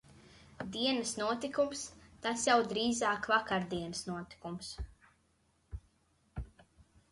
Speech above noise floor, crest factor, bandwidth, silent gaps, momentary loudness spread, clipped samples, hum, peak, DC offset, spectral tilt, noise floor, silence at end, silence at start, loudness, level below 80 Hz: 39 dB; 20 dB; 11.5 kHz; none; 21 LU; under 0.1%; none; -16 dBFS; under 0.1%; -3.5 dB/octave; -73 dBFS; 0.3 s; 0.1 s; -34 LUFS; -56 dBFS